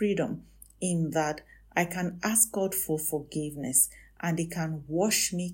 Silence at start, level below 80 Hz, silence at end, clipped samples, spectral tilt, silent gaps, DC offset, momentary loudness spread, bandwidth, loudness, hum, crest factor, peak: 0 s; -58 dBFS; 0 s; under 0.1%; -3.5 dB/octave; none; under 0.1%; 10 LU; 16.5 kHz; -28 LUFS; none; 20 dB; -10 dBFS